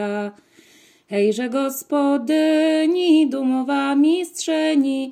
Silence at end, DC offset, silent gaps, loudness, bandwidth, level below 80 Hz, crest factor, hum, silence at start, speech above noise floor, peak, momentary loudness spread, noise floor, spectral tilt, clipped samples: 0 s; under 0.1%; none; -19 LUFS; 16 kHz; -80 dBFS; 12 dB; none; 0 s; 33 dB; -6 dBFS; 7 LU; -52 dBFS; -4.5 dB/octave; under 0.1%